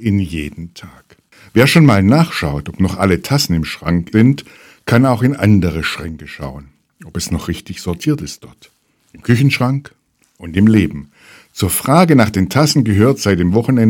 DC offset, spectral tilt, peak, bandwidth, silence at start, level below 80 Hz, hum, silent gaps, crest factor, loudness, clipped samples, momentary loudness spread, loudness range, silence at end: under 0.1%; -6 dB/octave; 0 dBFS; 18 kHz; 0 s; -38 dBFS; none; none; 14 dB; -14 LUFS; 0.2%; 18 LU; 6 LU; 0 s